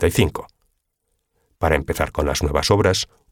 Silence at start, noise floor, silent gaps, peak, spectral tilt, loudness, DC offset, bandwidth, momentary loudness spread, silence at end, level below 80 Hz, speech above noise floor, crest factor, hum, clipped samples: 0 s; -72 dBFS; none; -2 dBFS; -4.5 dB/octave; -20 LUFS; under 0.1%; 18.5 kHz; 7 LU; 0.25 s; -32 dBFS; 53 dB; 18 dB; none; under 0.1%